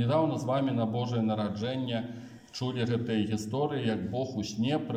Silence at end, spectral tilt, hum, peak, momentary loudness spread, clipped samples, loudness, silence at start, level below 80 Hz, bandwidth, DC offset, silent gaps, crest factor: 0 s; -6.5 dB/octave; none; -16 dBFS; 6 LU; under 0.1%; -31 LUFS; 0 s; -68 dBFS; 10 kHz; under 0.1%; none; 14 dB